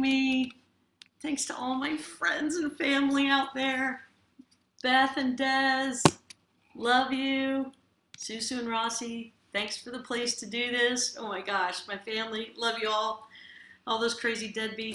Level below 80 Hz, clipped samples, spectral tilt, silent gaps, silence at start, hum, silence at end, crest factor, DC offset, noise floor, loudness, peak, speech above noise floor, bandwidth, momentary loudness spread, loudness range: -70 dBFS; under 0.1%; -3 dB/octave; none; 0 s; none; 0 s; 28 dB; under 0.1%; -63 dBFS; -29 LUFS; -4 dBFS; 34 dB; 12 kHz; 12 LU; 5 LU